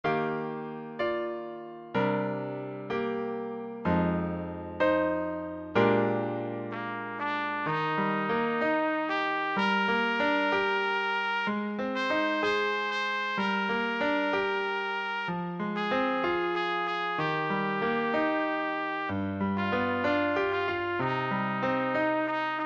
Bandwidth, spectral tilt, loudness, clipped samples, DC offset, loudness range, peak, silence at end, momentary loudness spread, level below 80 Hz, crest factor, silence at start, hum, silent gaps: 8 kHz; -6.5 dB/octave; -29 LUFS; under 0.1%; under 0.1%; 3 LU; -12 dBFS; 0 s; 8 LU; -62 dBFS; 18 dB; 0.05 s; none; none